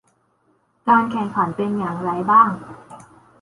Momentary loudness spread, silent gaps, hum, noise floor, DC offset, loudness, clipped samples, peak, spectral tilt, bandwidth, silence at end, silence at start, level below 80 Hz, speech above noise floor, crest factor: 13 LU; none; none; -63 dBFS; under 0.1%; -19 LUFS; under 0.1%; -2 dBFS; -7.5 dB/octave; 11.5 kHz; 0.4 s; 0.85 s; -60 dBFS; 45 dB; 18 dB